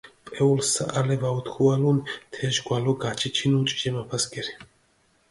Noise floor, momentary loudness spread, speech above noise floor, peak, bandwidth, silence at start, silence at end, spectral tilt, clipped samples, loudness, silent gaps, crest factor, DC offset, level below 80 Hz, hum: -64 dBFS; 11 LU; 40 dB; -8 dBFS; 11.5 kHz; 0.05 s; 0.65 s; -4.5 dB/octave; under 0.1%; -25 LUFS; none; 18 dB; under 0.1%; -60 dBFS; none